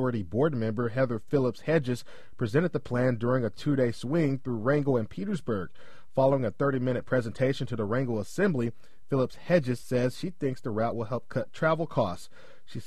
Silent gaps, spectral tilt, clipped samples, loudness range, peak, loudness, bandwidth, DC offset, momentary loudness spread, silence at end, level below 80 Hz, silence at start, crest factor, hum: none; -7.5 dB/octave; under 0.1%; 1 LU; -10 dBFS; -29 LUFS; 13 kHz; 1%; 7 LU; 0.05 s; -58 dBFS; 0 s; 18 dB; none